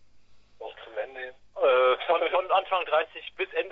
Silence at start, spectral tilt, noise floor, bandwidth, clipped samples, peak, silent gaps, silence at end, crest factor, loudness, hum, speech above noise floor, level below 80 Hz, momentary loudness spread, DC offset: 0.15 s; -4.5 dB/octave; -52 dBFS; 4.8 kHz; under 0.1%; -10 dBFS; none; 0 s; 18 dB; -26 LUFS; none; 23 dB; -68 dBFS; 18 LU; under 0.1%